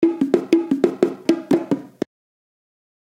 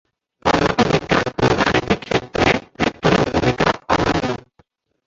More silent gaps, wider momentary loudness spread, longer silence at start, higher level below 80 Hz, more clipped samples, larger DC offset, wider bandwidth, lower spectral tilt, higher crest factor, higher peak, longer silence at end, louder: neither; first, 13 LU vs 6 LU; second, 0 s vs 0.45 s; second, -64 dBFS vs -38 dBFS; neither; neither; first, 11.5 kHz vs 8 kHz; first, -7 dB/octave vs -5.5 dB/octave; about the same, 20 dB vs 18 dB; about the same, 0 dBFS vs 0 dBFS; first, 1.15 s vs 0.7 s; about the same, -20 LUFS vs -18 LUFS